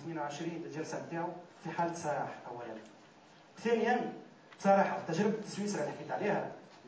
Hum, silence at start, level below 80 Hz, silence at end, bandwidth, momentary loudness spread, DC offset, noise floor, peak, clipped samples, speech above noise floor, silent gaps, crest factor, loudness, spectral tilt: none; 0 s; -84 dBFS; 0 s; 8 kHz; 16 LU; under 0.1%; -59 dBFS; -16 dBFS; under 0.1%; 24 dB; none; 20 dB; -35 LUFS; -5.5 dB/octave